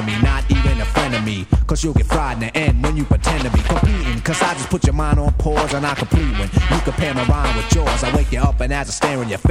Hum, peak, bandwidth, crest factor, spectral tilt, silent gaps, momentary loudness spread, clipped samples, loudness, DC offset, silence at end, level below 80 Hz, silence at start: none; 0 dBFS; 13 kHz; 16 dB; -5.5 dB/octave; none; 3 LU; under 0.1%; -18 LUFS; under 0.1%; 0 s; -20 dBFS; 0 s